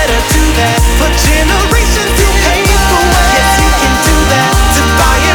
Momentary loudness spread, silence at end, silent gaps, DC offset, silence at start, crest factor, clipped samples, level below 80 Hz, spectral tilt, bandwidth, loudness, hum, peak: 2 LU; 0 s; none; under 0.1%; 0 s; 8 dB; under 0.1%; -12 dBFS; -3.5 dB/octave; over 20 kHz; -9 LUFS; none; 0 dBFS